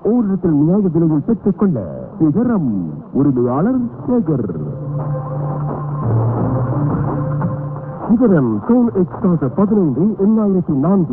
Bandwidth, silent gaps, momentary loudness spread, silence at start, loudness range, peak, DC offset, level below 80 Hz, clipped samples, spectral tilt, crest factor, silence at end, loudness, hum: 2.4 kHz; none; 8 LU; 0 s; 4 LU; -2 dBFS; under 0.1%; -42 dBFS; under 0.1%; -14.5 dB/octave; 14 dB; 0 s; -16 LUFS; none